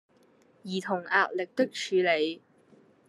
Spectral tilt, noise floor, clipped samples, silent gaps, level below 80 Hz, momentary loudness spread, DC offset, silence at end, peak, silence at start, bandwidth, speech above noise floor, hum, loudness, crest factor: -4.5 dB/octave; -62 dBFS; under 0.1%; none; -86 dBFS; 11 LU; under 0.1%; 0.7 s; -8 dBFS; 0.65 s; 12 kHz; 34 dB; none; -28 LUFS; 22 dB